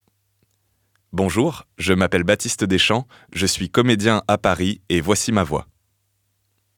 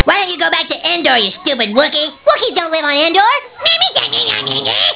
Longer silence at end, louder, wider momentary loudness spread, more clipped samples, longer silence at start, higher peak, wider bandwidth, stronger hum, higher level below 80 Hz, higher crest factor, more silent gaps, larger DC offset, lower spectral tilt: first, 1.15 s vs 0 s; second, -19 LUFS vs -12 LUFS; first, 7 LU vs 4 LU; second, under 0.1% vs 0.2%; first, 1.15 s vs 0 s; about the same, -2 dBFS vs 0 dBFS; first, 19 kHz vs 4 kHz; neither; about the same, -46 dBFS vs -48 dBFS; first, 20 dB vs 14 dB; neither; neither; second, -4.5 dB/octave vs -6.5 dB/octave